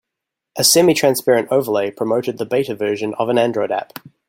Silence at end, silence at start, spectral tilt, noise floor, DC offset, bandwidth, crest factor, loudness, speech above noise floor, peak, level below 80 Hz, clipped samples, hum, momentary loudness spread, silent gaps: 0.2 s; 0.55 s; -3.5 dB/octave; -82 dBFS; under 0.1%; 17 kHz; 18 dB; -17 LUFS; 65 dB; 0 dBFS; -62 dBFS; under 0.1%; none; 10 LU; none